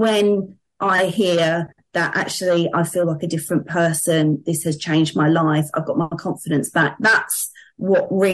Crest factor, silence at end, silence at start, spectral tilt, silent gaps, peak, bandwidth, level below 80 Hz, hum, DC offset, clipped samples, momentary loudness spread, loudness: 14 dB; 0 s; 0 s; -5 dB/octave; none; -6 dBFS; 12.5 kHz; -62 dBFS; none; under 0.1%; under 0.1%; 8 LU; -19 LUFS